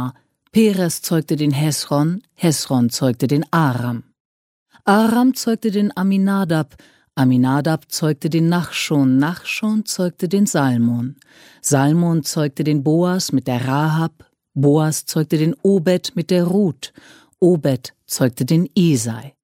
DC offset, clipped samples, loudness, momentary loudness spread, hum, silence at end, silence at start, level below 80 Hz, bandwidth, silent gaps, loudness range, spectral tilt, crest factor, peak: under 0.1%; under 0.1%; -18 LUFS; 6 LU; none; 0.15 s; 0 s; -60 dBFS; 16.5 kHz; 4.20-4.66 s; 1 LU; -6 dB/octave; 16 dB; -2 dBFS